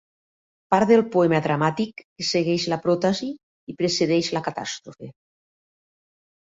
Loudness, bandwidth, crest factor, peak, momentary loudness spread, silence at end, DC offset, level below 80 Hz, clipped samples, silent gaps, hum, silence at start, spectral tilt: -22 LUFS; 8 kHz; 20 dB; -4 dBFS; 19 LU; 1.4 s; under 0.1%; -62 dBFS; under 0.1%; 2.04-2.16 s, 3.43-3.67 s; none; 0.7 s; -5 dB/octave